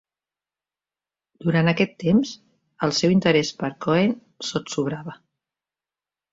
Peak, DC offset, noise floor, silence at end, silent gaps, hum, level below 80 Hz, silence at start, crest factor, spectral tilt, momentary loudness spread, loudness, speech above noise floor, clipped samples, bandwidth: -4 dBFS; under 0.1%; under -90 dBFS; 1.2 s; none; 50 Hz at -45 dBFS; -58 dBFS; 1.4 s; 20 dB; -5.5 dB/octave; 12 LU; -22 LUFS; over 69 dB; under 0.1%; 7.8 kHz